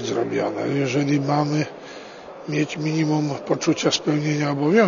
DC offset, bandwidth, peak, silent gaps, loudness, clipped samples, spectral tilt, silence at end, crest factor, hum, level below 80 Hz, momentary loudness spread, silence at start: under 0.1%; 7.4 kHz; -4 dBFS; none; -22 LUFS; under 0.1%; -5.5 dB/octave; 0 s; 18 dB; none; -64 dBFS; 14 LU; 0 s